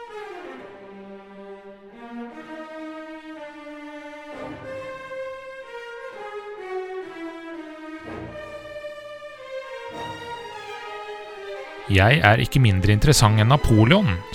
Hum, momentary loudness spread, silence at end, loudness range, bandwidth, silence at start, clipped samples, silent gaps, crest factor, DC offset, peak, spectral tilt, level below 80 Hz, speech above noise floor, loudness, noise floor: none; 23 LU; 0 s; 19 LU; 16 kHz; 0 s; under 0.1%; none; 24 dB; under 0.1%; 0 dBFS; -5.5 dB/octave; -38 dBFS; 26 dB; -20 LUFS; -43 dBFS